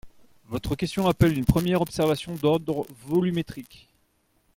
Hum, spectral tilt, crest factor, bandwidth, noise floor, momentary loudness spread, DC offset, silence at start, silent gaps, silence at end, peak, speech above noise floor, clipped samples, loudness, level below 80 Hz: none; -7 dB/octave; 20 dB; 17 kHz; -68 dBFS; 12 LU; under 0.1%; 0.05 s; none; 0.9 s; -6 dBFS; 43 dB; under 0.1%; -25 LUFS; -42 dBFS